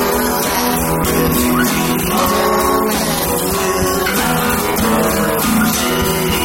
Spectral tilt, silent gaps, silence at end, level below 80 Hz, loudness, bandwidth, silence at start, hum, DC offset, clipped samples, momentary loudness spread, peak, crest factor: -4 dB/octave; none; 0 s; -32 dBFS; -14 LUFS; 16.5 kHz; 0 s; none; under 0.1%; under 0.1%; 2 LU; -2 dBFS; 12 dB